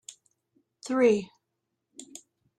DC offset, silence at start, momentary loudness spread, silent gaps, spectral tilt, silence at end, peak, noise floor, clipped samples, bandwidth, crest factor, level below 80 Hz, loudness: under 0.1%; 0.85 s; 25 LU; none; -5 dB/octave; 0.55 s; -12 dBFS; -82 dBFS; under 0.1%; 11 kHz; 20 dB; -74 dBFS; -25 LUFS